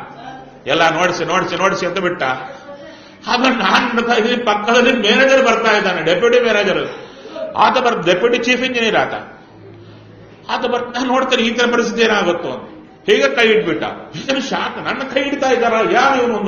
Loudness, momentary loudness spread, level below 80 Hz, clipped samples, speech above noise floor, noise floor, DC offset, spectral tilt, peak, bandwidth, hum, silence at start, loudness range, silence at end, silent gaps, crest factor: -15 LUFS; 15 LU; -52 dBFS; under 0.1%; 25 dB; -40 dBFS; under 0.1%; -1.5 dB/octave; 0 dBFS; 7.2 kHz; none; 0 s; 5 LU; 0 s; none; 16 dB